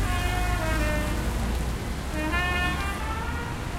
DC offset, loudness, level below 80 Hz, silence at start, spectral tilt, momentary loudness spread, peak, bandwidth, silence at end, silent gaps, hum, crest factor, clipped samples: under 0.1%; -28 LUFS; -30 dBFS; 0 s; -5 dB/octave; 6 LU; -14 dBFS; 16 kHz; 0 s; none; none; 14 dB; under 0.1%